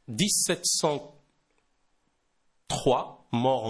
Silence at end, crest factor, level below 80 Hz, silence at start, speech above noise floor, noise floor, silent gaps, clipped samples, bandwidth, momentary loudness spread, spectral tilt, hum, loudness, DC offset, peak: 0 s; 18 dB; -58 dBFS; 0.1 s; 46 dB; -72 dBFS; none; under 0.1%; 11 kHz; 10 LU; -3 dB/octave; none; -26 LUFS; under 0.1%; -12 dBFS